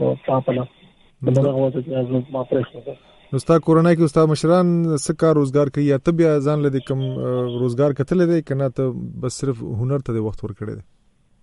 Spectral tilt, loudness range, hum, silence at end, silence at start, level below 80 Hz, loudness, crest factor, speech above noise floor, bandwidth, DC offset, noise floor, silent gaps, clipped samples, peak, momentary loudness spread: -7.5 dB/octave; 5 LU; none; 0.6 s; 0 s; -48 dBFS; -19 LUFS; 16 dB; 38 dB; 11.5 kHz; under 0.1%; -57 dBFS; none; under 0.1%; -2 dBFS; 12 LU